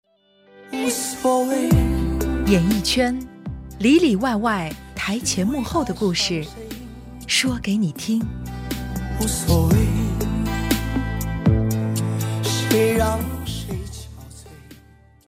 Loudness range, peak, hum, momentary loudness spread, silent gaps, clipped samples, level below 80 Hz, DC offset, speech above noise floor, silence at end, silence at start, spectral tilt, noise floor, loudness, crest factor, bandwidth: 4 LU; -4 dBFS; none; 15 LU; none; under 0.1%; -32 dBFS; under 0.1%; 36 dB; 0.5 s; 0.55 s; -5 dB/octave; -56 dBFS; -21 LUFS; 18 dB; 16 kHz